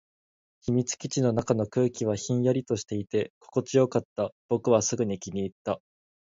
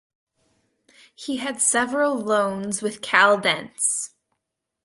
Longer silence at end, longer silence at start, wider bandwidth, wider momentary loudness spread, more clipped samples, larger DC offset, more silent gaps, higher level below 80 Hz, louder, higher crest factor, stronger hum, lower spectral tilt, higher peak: second, 0.55 s vs 0.75 s; second, 0.65 s vs 1.2 s; second, 7.8 kHz vs 11.5 kHz; about the same, 9 LU vs 11 LU; neither; neither; first, 3.30-3.41 s, 4.05-4.16 s, 4.32-4.49 s, 5.52-5.65 s vs none; first, -60 dBFS vs -68 dBFS; second, -28 LUFS vs -21 LUFS; about the same, 20 dB vs 22 dB; neither; first, -6 dB/octave vs -2 dB/octave; second, -8 dBFS vs -2 dBFS